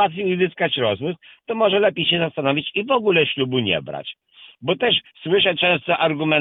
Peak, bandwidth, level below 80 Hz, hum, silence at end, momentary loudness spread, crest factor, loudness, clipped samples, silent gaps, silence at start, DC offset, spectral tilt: -2 dBFS; 4.1 kHz; -60 dBFS; none; 0 s; 12 LU; 18 dB; -19 LUFS; under 0.1%; none; 0 s; under 0.1%; -8.5 dB/octave